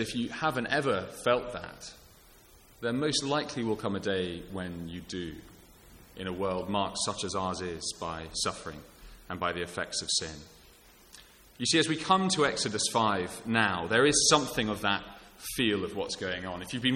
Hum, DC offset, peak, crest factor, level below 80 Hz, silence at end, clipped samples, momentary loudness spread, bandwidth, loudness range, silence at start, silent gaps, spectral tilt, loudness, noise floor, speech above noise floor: none; under 0.1%; -8 dBFS; 24 dB; -56 dBFS; 0 s; under 0.1%; 15 LU; 17 kHz; 9 LU; 0 s; none; -3 dB/octave; -30 LUFS; -57 dBFS; 26 dB